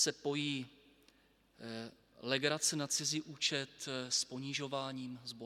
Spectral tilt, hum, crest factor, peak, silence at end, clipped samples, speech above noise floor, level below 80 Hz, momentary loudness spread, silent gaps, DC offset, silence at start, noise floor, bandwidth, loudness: -2.5 dB/octave; none; 22 dB; -16 dBFS; 0 s; under 0.1%; 31 dB; -80 dBFS; 14 LU; none; under 0.1%; 0 s; -70 dBFS; 16.5 kHz; -37 LUFS